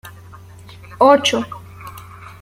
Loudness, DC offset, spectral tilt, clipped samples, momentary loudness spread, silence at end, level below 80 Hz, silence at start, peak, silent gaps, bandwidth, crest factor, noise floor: -14 LUFS; under 0.1%; -3.5 dB/octave; under 0.1%; 26 LU; 0.15 s; -52 dBFS; 0.05 s; -2 dBFS; none; 16 kHz; 18 dB; -39 dBFS